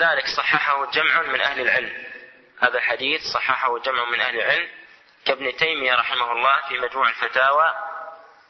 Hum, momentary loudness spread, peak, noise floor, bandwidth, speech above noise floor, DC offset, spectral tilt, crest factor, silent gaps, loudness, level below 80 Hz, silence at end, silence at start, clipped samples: none; 12 LU; -2 dBFS; -43 dBFS; 6.4 kHz; 22 dB; under 0.1%; -2.5 dB/octave; 20 dB; none; -20 LUFS; -64 dBFS; 0.25 s; 0 s; under 0.1%